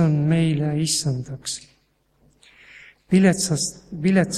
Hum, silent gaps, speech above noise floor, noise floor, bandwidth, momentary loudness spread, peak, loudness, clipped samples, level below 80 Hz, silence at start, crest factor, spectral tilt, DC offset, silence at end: none; none; 43 dB; -64 dBFS; 14 kHz; 12 LU; -4 dBFS; -21 LUFS; under 0.1%; -54 dBFS; 0 s; 18 dB; -5 dB/octave; under 0.1%; 0 s